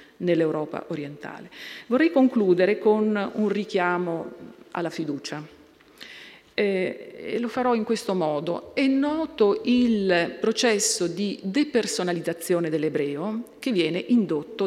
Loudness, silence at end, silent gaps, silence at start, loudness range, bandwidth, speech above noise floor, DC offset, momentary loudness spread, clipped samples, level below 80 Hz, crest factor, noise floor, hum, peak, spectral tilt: -24 LUFS; 0 s; none; 0 s; 6 LU; 15.5 kHz; 24 dB; under 0.1%; 16 LU; under 0.1%; -66 dBFS; 16 dB; -48 dBFS; none; -8 dBFS; -4.5 dB/octave